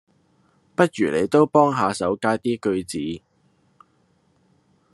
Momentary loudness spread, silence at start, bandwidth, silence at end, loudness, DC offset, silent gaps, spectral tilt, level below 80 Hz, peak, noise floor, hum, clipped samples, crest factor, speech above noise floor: 12 LU; 0.8 s; 12.5 kHz; 1.75 s; -21 LUFS; under 0.1%; none; -6 dB/octave; -64 dBFS; -2 dBFS; -63 dBFS; none; under 0.1%; 22 dB; 43 dB